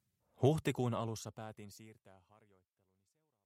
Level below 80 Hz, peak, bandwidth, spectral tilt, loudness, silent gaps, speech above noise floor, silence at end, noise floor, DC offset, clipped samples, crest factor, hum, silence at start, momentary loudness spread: -70 dBFS; -16 dBFS; 16 kHz; -6.5 dB/octave; -37 LUFS; none; 44 dB; 1.35 s; -82 dBFS; under 0.1%; under 0.1%; 24 dB; none; 0.4 s; 21 LU